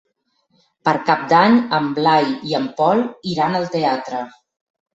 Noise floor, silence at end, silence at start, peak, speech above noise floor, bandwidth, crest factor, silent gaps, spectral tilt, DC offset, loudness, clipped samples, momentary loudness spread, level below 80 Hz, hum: -66 dBFS; 0.65 s; 0.85 s; -2 dBFS; 49 dB; 8 kHz; 18 dB; none; -6 dB/octave; under 0.1%; -18 LUFS; under 0.1%; 10 LU; -62 dBFS; none